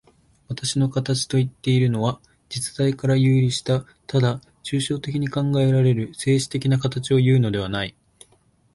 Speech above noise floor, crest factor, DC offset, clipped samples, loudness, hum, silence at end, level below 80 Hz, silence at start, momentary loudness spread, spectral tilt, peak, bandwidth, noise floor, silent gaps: 39 dB; 14 dB; under 0.1%; under 0.1%; -22 LUFS; none; 0.85 s; -52 dBFS; 0.5 s; 10 LU; -6 dB/octave; -8 dBFS; 11.5 kHz; -60 dBFS; none